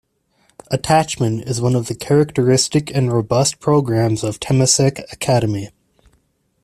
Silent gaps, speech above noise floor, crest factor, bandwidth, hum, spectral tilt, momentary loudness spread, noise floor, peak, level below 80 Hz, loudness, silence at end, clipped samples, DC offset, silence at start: none; 45 dB; 16 dB; 14 kHz; none; -5 dB/octave; 8 LU; -62 dBFS; 0 dBFS; -48 dBFS; -17 LUFS; 0.95 s; under 0.1%; under 0.1%; 0.7 s